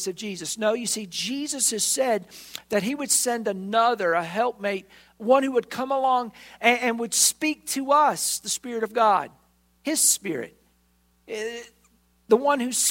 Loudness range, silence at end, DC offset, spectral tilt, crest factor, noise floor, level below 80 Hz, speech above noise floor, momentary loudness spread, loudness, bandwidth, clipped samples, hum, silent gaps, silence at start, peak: 3 LU; 0 s; under 0.1%; -1.5 dB/octave; 20 dB; -64 dBFS; -68 dBFS; 40 dB; 14 LU; -23 LUFS; 16.5 kHz; under 0.1%; none; none; 0 s; -4 dBFS